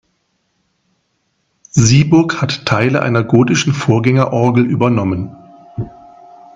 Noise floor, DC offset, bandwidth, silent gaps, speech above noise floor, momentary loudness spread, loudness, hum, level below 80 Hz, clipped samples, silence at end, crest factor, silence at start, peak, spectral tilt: -65 dBFS; under 0.1%; 7.8 kHz; none; 53 dB; 17 LU; -13 LUFS; none; -44 dBFS; under 0.1%; 0.65 s; 14 dB; 1.75 s; 0 dBFS; -6 dB/octave